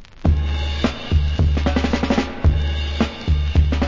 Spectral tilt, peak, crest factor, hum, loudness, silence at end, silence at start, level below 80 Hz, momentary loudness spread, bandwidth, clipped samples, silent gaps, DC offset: -7 dB/octave; -2 dBFS; 16 dB; none; -20 LUFS; 0 s; 0 s; -20 dBFS; 4 LU; 7.4 kHz; under 0.1%; none; under 0.1%